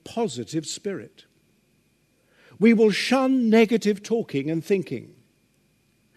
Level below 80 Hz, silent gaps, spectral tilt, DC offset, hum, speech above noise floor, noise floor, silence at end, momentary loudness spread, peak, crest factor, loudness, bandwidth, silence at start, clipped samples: -72 dBFS; none; -5.5 dB/octave; under 0.1%; none; 43 dB; -65 dBFS; 1.1 s; 14 LU; -6 dBFS; 18 dB; -22 LUFS; 13.5 kHz; 0.05 s; under 0.1%